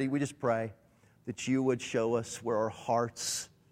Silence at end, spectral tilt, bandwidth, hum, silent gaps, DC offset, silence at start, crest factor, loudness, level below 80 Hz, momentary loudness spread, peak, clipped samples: 0.25 s; -4.5 dB/octave; 16 kHz; none; none; under 0.1%; 0 s; 16 dB; -33 LUFS; -70 dBFS; 8 LU; -16 dBFS; under 0.1%